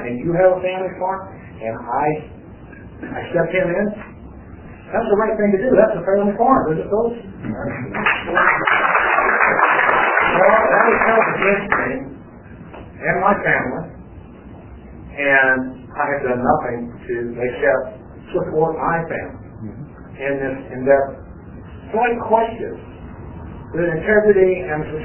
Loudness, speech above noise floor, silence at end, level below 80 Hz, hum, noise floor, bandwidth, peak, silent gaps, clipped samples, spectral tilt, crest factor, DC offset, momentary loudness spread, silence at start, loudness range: -17 LUFS; 20 dB; 0 s; -44 dBFS; none; -38 dBFS; 3.2 kHz; 0 dBFS; none; under 0.1%; -9.5 dB/octave; 18 dB; under 0.1%; 21 LU; 0 s; 8 LU